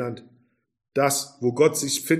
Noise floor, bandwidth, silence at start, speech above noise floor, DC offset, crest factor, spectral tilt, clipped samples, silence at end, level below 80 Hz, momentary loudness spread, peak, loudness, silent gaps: -63 dBFS; 15.5 kHz; 0 s; 40 dB; under 0.1%; 18 dB; -4 dB/octave; under 0.1%; 0 s; -70 dBFS; 12 LU; -6 dBFS; -23 LUFS; none